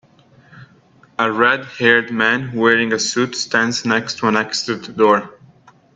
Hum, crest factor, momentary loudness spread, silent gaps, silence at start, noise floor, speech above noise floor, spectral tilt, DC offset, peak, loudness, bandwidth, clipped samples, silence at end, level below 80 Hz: none; 18 dB; 7 LU; none; 0.55 s; -51 dBFS; 34 dB; -3.5 dB/octave; under 0.1%; 0 dBFS; -16 LUFS; 8.8 kHz; under 0.1%; 0.65 s; -64 dBFS